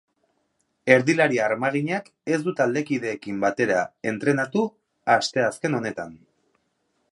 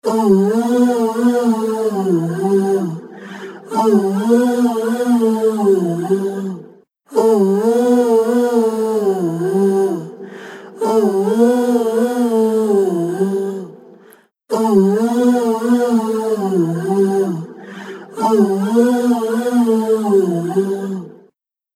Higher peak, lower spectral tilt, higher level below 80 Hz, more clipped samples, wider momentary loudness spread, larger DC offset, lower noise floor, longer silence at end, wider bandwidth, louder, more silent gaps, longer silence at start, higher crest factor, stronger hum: about the same, 0 dBFS vs 0 dBFS; second, -5.5 dB/octave vs -7 dB/octave; about the same, -68 dBFS vs -68 dBFS; neither; about the same, 11 LU vs 13 LU; neither; first, -72 dBFS vs -57 dBFS; first, 0.95 s vs 0.65 s; second, 11.5 kHz vs 15.5 kHz; second, -23 LUFS vs -16 LUFS; neither; first, 0.85 s vs 0.05 s; first, 24 dB vs 14 dB; neither